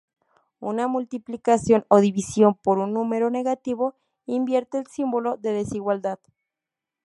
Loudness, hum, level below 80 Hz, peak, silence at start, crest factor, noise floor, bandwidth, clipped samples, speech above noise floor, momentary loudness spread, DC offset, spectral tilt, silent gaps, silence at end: -23 LUFS; none; -60 dBFS; -2 dBFS; 0.6 s; 22 dB; -87 dBFS; 11.5 kHz; under 0.1%; 65 dB; 12 LU; under 0.1%; -6.5 dB/octave; none; 0.9 s